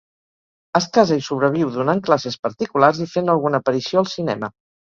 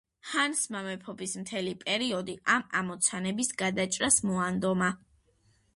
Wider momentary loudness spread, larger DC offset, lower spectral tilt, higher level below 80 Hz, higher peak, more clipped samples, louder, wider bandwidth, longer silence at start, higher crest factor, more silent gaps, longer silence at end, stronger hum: second, 8 LU vs 12 LU; neither; first, -6 dB/octave vs -3 dB/octave; about the same, -60 dBFS vs -64 dBFS; first, 0 dBFS vs -8 dBFS; neither; first, -19 LUFS vs -29 LUFS; second, 7.6 kHz vs 11.5 kHz; first, 0.75 s vs 0.25 s; about the same, 20 dB vs 22 dB; first, 2.39-2.43 s vs none; second, 0.35 s vs 0.8 s; neither